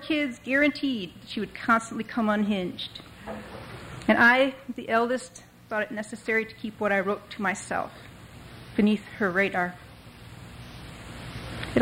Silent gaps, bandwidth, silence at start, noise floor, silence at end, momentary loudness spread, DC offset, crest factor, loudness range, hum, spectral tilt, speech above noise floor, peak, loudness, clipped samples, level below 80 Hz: none; 16 kHz; 0 s; -46 dBFS; 0 s; 20 LU; under 0.1%; 20 dB; 5 LU; none; -5 dB/octave; 20 dB; -8 dBFS; -26 LUFS; under 0.1%; -54 dBFS